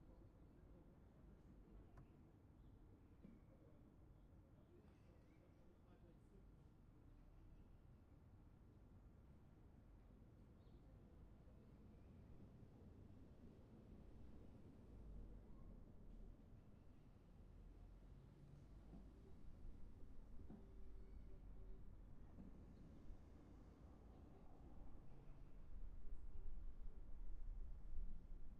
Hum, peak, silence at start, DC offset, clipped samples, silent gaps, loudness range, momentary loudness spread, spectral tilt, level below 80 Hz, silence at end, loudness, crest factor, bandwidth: none; -36 dBFS; 0 s; under 0.1%; under 0.1%; none; 6 LU; 8 LU; -8.5 dB/octave; -60 dBFS; 0 s; -66 LUFS; 20 dB; 4.6 kHz